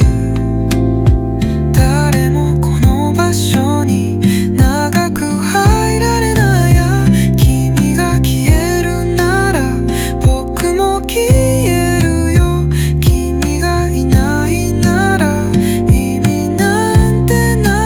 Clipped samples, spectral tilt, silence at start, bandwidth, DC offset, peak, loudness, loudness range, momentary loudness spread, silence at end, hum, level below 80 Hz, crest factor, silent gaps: under 0.1%; -6 dB/octave; 0 s; 20 kHz; under 0.1%; 0 dBFS; -13 LUFS; 2 LU; 4 LU; 0 s; none; -20 dBFS; 12 dB; none